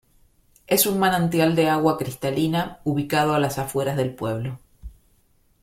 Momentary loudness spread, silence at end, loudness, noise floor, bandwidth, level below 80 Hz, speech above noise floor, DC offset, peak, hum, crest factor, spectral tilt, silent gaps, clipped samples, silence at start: 9 LU; 0.7 s; -22 LUFS; -61 dBFS; 16.5 kHz; -50 dBFS; 40 dB; under 0.1%; -4 dBFS; none; 18 dB; -5 dB/octave; none; under 0.1%; 0.7 s